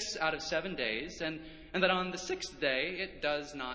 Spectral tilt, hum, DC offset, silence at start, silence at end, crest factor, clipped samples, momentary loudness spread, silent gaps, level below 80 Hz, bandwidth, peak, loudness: -3 dB/octave; none; under 0.1%; 0 s; 0 s; 22 dB; under 0.1%; 9 LU; none; -60 dBFS; 8 kHz; -12 dBFS; -34 LUFS